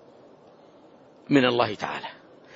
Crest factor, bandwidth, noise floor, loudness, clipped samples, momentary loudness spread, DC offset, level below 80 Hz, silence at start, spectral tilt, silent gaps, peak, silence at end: 22 dB; 7.6 kHz; -53 dBFS; -24 LUFS; under 0.1%; 15 LU; under 0.1%; -68 dBFS; 1.3 s; -6 dB/octave; none; -6 dBFS; 0.4 s